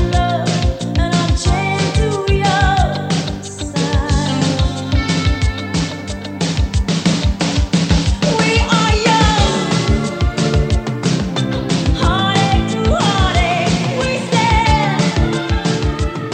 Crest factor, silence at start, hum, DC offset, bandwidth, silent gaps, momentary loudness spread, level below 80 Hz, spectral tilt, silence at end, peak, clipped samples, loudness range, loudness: 14 dB; 0 s; none; under 0.1%; 9.6 kHz; none; 6 LU; -22 dBFS; -5 dB/octave; 0 s; 0 dBFS; under 0.1%; 3 LU; -16 LUFS